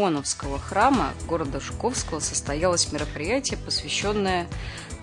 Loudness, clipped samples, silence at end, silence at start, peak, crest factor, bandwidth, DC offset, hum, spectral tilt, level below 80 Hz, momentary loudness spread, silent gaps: -25 LUFS; under 0.1%; 0 s; 0 s; -6 dBFS; 18 dB; 11 kHz; under 0.1%; none; -3.5 dB/octave; -40 dBFS; 8 LU; none